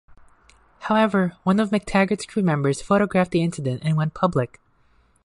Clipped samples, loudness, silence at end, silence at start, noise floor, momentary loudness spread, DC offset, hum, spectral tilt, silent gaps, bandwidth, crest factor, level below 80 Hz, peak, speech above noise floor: under 0.1%; -22 LUFS; 0.8 s; 0.8 s; -60 dBFS; 6 LU; under 0.1%; none; -7 dB/octave; none; 11.5 kHz; 16 dB; -52 dBFS; -6 dBFS; 39 dB